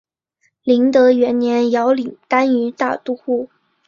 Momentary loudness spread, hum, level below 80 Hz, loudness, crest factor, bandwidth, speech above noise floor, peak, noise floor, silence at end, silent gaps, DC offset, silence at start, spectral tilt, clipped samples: 10 LU; none; -64 dBFS; -16 LUFS; 14 dB; 7.2 kHz; 50 dB; -2 dBFS; -65 dBFS; 0.4 s; none; under 0.1%; 0.65 s; -5.5 dB/octave; under 0.1%